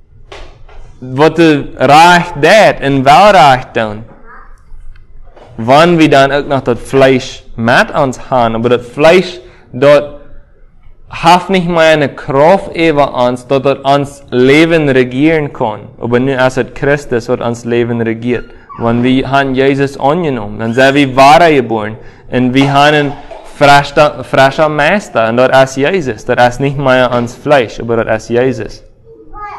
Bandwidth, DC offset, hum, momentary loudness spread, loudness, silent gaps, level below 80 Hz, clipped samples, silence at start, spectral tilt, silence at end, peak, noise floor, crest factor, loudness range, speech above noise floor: 16 kHz; under 0.1%; none; 11 LU; -9 LUFS; none; -36 dBFS; 2%; 0.3 s; -5.5 dB/octave; 0 s; 0 dBFS; -36 dBFS; 10 dB; 5 LU; 27 dB